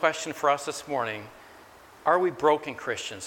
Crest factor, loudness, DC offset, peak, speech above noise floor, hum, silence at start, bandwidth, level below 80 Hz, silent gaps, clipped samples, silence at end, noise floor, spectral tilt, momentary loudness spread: 22 dB; -27 LUFS; under 0.1%; -6 dBFS; 24 dB; none; 0 s; 18.5 kHz; -68 dBFS; none; under 0.1%; 0 s; -51 dBFS; -3.5 dB/octave; 9 LU